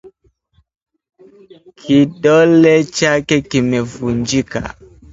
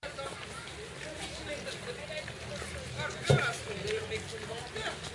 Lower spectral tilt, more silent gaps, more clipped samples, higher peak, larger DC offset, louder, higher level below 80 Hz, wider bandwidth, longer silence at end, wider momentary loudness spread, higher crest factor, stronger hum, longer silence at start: first, -5.5 dB/octave vs -4 dB/octave; first, 0.82-0.86 s vs none; neither; first, 0 dBFS vs -12 dBFS; neither; first, -14 LUFS vs -36 LUFS; first, -44 dBFS vs -56 dBFS; second, 8 kHz vs 11.5 kHz; first, 0.4 s vs 0 s; about the same, 14 LU vs 13 LU; second, 16 dB vs 26 dB; neither; about the same, 0.05 s vs 0 s